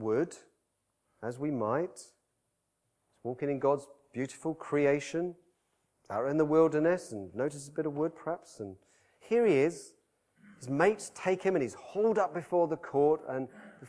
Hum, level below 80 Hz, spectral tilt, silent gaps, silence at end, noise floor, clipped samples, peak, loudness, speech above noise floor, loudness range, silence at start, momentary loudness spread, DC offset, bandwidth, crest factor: none; -76 dBFS; -6.5 dB/octave; none; 0 s; -81 dBFS; under 0.1%; -12 dBFS; -31 LUFS; 50 dB; 5 LU; 0 s; 15 LU; under 0.1%; 11 kHz; 20 dB